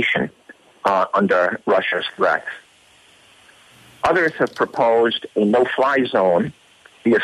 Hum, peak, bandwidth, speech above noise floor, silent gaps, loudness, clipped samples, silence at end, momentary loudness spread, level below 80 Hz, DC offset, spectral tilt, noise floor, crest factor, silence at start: none; -4 dBFS; 13 kHz; 34 dB; none; -19 LUFS; under 0.1%; 0 s; 7 LU; -60 dBFS; under 0.1%; -6 dB/octave; -52 dBFS; 14 dB; 0 s